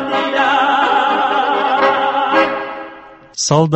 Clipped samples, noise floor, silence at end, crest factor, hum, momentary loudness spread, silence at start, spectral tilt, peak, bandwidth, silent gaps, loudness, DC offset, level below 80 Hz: under 0.1%; -37 dBFS; 0 s; 14 dB; none; 13 LU; 0 s; -4 dB/octave; 0 dBFS; 8.4 kHz; none; -14 LUFS; under 0.1%; -56 dBFS